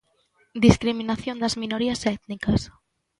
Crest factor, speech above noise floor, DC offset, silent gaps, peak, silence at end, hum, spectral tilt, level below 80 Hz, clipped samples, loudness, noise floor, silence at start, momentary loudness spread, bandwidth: 24 dB; 42 dB; under 0.1%; none; 0 dBFS; 0.5 s; none; -5.5 dB/octave; -40 dBFS; under 0.1%; -24 LUFS; -65 dBFS; 0.55 s; 10 LU; 11.5 kHz